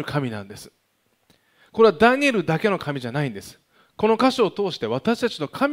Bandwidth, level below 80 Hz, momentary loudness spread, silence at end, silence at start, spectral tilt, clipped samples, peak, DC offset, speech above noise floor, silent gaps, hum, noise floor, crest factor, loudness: 16 kHz; -58 dBFS; 16 LU; 0 s; 0 s; -6 dB/octave; under 0.1%; -4 dBFS; under 0.1%; 46 dB; none; none; -68 dBFS; 18 dB; -21 LUFS